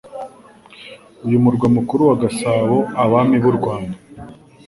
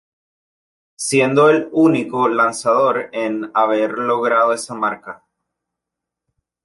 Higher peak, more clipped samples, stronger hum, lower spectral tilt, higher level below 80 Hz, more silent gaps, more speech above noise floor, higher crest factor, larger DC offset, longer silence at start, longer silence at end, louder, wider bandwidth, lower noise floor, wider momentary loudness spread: about the same, -2 dBFS vs -2 dBFS; neither; neither; first, -7.5 dB/octave vs -5 dB/octave; first, -50 dBFS vs -66 dBFS; neither; second, 29 dB vs 67 dB; about the same, 16 dB vs 16 dB; neither; second, 0.05 s vs 1 s; second, 0.35 s vs 1.5 s; about the same, -16 LUFS vs -17 LUFS; about the same, 11.5 kHz vs 12 kHz; second, -44 dBFS vs -83 dBFS; first, 19 LU vs 9 LU